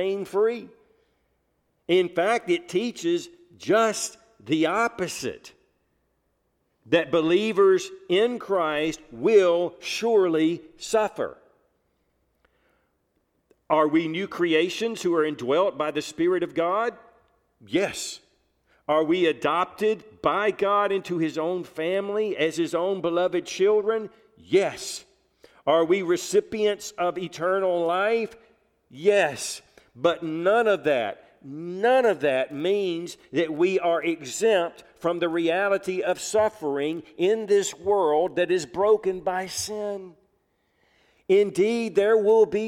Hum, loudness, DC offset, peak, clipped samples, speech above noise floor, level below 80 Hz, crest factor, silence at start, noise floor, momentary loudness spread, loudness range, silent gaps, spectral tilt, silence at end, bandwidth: none; -24 LUFS; under 0.1%; -6 dBFS; under 0.1%; 48 dB; -66 dBFS; 18 dB; 0 s; -72 dBFS; 10 LU; 4 LU; none; -4 dB/octave; 0 s; 15 kHz